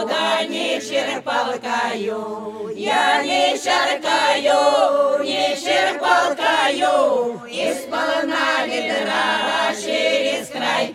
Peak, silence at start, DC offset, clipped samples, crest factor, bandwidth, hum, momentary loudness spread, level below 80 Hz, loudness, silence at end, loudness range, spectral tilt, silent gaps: -2 dBFS; 0 s; under 0.1%; under 0.1%; 16 dB; 15 kHz; none; 7 LU; -72 dBFS; -19 LUFS; 0 s; 3 LU; -2 dB/octave; none